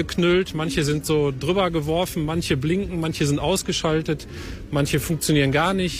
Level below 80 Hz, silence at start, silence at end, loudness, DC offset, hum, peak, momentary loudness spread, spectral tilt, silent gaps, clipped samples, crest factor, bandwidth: -40 dBFS; 0 s; 0 s; -22 LUFS; under 0.1%; none; -6 dBFS; 6 LU; -5 dB/octave; none; under 0.1%; 16 dB; 16 kHz